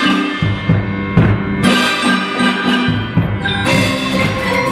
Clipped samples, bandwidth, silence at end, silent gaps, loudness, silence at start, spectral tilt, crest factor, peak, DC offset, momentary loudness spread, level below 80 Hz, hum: under 0.1%; 15.5 kHz; 0 s; none; -14 LUFS; 0 s; -5.5 dB/octave; 14 dB; 0 dBFS; under 0.1%; 4 LU; -34 dBFS; none